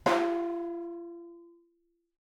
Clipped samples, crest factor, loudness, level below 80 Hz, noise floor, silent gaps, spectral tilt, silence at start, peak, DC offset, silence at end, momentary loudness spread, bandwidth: under 0.1%; 22 dB; -33 LUFS; -70 dBFS; -74 dBFS; none; -5 dB/octave; 0.05 s; -12 dBFS; under 0.1%; 0.9 s; 20 LU; 14.5 kHz